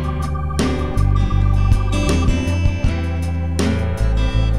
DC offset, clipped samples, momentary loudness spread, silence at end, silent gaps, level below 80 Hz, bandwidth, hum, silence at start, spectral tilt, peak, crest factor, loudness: 3%; under 0.1%; 5 LU; 0 s; none; -20 dBFS; 12.5 kHz; none; 0 s; -6.5 dB/octave; -2 dBFS; 16 dB; -19 LUFS